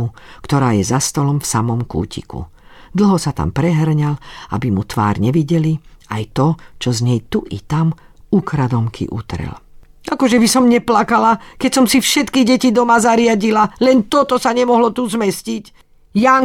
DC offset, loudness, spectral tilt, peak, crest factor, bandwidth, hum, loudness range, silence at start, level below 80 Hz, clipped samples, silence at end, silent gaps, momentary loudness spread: under 0.1%; -15 LUFS; -5.5 dB/octave; 0 dBFS; 16 dB; 16.5 kHz; none; 6 LU; 0 s; -40 dBFS; under 0.1%; 0 s; none; 13 LU